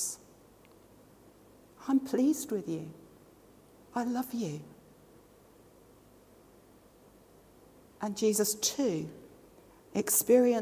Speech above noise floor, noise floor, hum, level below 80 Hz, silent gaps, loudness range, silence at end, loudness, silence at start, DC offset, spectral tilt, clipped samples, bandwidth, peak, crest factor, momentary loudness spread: 30 dB; -59 dBFS; none; -70 dBFS; none; 9 LU; 0 s; -30 LUFS; 0 s; under 0.1%; -4 dB/octave; under 0.1%; 16 kHz; -12 dBFS; 20 dB; 19 LU